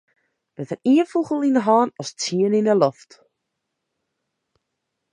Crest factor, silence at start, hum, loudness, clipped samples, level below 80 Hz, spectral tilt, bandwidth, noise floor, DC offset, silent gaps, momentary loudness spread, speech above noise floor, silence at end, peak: 20 dB; 0.6 s; none; -20 LUFS; under 0.1%; -74 dBFS; -5.5 dB/octave; 10 kHz; -79 dBFS; under 0.1%; none; 9 LU; 59 dB; 2.2 s; -2 dBFS